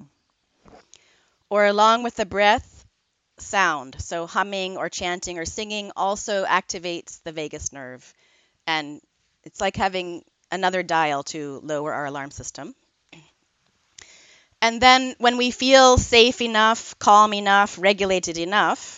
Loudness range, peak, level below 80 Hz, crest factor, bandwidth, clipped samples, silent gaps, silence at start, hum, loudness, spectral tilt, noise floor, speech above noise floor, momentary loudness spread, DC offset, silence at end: 12 LU; 0 dBFS; -48 dBFS; 22 dB; 9.4 kHz; under 0.1%; none; 1.5 s; none; -20 LUFS; -3 dB/octave; -71 dBFS; 50 dB; 18 LU; under 0.1%; 0 s